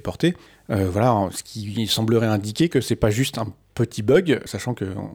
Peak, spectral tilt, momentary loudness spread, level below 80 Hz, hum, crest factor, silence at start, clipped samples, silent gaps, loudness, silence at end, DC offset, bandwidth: -4 dBFS; -5.5 dB/octave; 10 LU; -46 dBFS; none; 18 dB; 0.05 s; under 0.1%; none; -22 LUFS; 0 s; under 0.1%; over 20 kHz